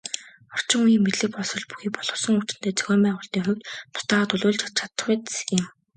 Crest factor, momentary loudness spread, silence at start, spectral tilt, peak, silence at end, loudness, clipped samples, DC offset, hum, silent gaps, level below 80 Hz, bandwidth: 22 dB; 10 LU; 0.05 s; -4 dB/octave; -4 dBFS; 0.25 s; -24 LUFS; under 0.1%; under 0.1%; none; none; -68 dBFS; 9.6 kHz